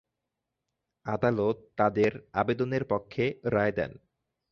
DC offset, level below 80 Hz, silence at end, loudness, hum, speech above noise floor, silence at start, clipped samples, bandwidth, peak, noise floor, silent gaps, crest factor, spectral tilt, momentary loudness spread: under 0.1%; -58 dBFS; 0.55 s; -29 LUFS; none; 57 dB; 1.05 s; under 0.1%; 7.2 kHz; -10 dBFS; -85 dBFS; none; 20 dB; -8 dB/octave; 8 LU